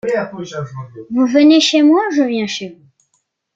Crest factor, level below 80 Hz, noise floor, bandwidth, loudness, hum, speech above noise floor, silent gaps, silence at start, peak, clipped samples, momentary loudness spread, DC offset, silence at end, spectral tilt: 14 dB; -62 dBFS; -66 dBFS; 7.8 kHz; -13 LUFS; none; 52 dB; none; 0.05 s; -2 dBFS; under 0.1%; 18 LU; under 0.1%; 0.8 s; -4.5 dB/octave